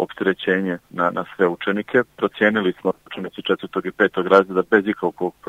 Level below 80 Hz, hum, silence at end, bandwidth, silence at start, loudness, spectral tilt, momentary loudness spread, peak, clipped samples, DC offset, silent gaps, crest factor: -64 dBFS; none; 0.2 s; 8.2 kHz; 0 s; -20 LUFS; -7 dB/octave; 10 LU; 0 dBFS; under 0.1%; under 0.1%; none; 20 dB